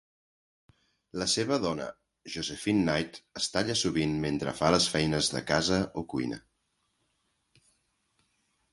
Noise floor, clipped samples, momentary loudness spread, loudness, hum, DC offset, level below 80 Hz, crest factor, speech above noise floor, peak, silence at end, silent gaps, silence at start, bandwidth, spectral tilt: -77 dBFS; under 0.1%; 11 LU; -29 LUFS; none; under 0.1%; -56 dBFS; 24 dB; 48 dB; -8 dBFS; 2.35 s; none; 1.15 s; 11.5 kHz; -4 dB/octave